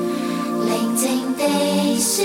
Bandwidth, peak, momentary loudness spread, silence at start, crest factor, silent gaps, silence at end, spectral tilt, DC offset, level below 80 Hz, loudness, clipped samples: 17 kHz; -6 dBFS; 5 LU; 0 s; 14 dB; none; 0 s; -3.5 dB/octave; under 0.1%; -62 dBFS; -20 LUFS; under 0.1%